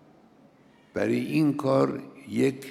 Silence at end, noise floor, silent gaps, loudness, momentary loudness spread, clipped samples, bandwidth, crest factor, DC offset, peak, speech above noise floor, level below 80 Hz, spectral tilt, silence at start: 0 s; -57 dBFS; none; -26 LUFS; 11 LU; under 0.1%; 15 kHz; 18 dB; under 0.1%; -10 dBFS; 32 dB; -68 dBFS; -7 dB/octave; 0.95 s